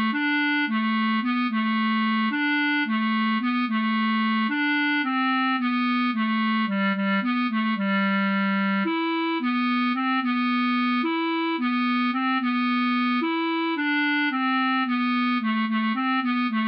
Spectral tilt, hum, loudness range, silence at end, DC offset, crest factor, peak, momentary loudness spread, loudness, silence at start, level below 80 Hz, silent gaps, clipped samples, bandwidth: -8 dB/octave; none; 1 LU; 0 s; under 0.1%; 8 dB; -16 dBFS; 2 LU; -23 LUFS; 0 s; -78 dBFS; none; under 0.1%; 5.6 kHz